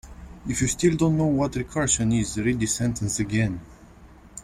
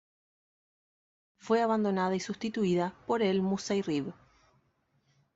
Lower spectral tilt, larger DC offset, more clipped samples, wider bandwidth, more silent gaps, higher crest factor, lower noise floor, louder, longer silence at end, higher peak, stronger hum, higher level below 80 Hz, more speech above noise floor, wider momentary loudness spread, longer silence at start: about the same, -5 dB/octave vs -6 dB/octave; neither; neither; first, 15.5 kHz vs 8 kHz; neither; about the same, 16 dB vs 18 dB; second, -48 dBFS vs -73 dBFS; first, -24 LUFS vs -30 LUFS; second, 0 s vs 1.25 s; first, -8 dBFS vs -14 dBFS; neither; first, -42 dBFS vs -70 dBFS; second, 25 dB vs 44 dB; first, 12 LU vs 6 LU; second, 0.05 s vs 1.45 s